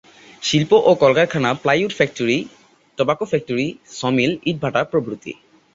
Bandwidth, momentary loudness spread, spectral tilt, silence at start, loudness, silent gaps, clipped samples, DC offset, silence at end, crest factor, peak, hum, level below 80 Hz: 7.8 kHz; 12 LU; -5 dB/octave; 0.4 s; -18 LUFS; none; under 0.1%; under 0.1%; 0.4 s; 18 dB; -2 dBFS; none; -56 dBFS